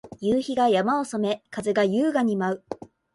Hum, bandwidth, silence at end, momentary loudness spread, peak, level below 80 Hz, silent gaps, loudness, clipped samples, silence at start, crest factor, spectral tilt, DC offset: none; 11.5 kHz; 0.4 s; 9 LU; -10 dBFS; -62 dBFS; none; -24 LUFS; under 0.1%; 0.05 s; 14 dB; -6 dB/octave; under 0.1%